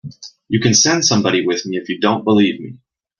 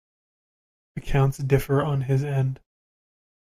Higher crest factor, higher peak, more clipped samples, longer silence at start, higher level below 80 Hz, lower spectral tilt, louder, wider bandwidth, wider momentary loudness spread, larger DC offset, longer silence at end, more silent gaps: about the same, 16 dB vs 20 dB; first, 0 dBFS vs -6 dBFS; neither; second, 0.05 s vs 0.95 s; second, -56 dBFS vs -40 dBFS; second, -3.5 dB/octave vs -7.5 dB/octave; first, -15 LUFS vs -24 LUFS; second, 11 kHz vs 14.5 kHz; about the same, 15 LU vs 17 LU; neither; second, 0.45 s vs 0.85 s; neither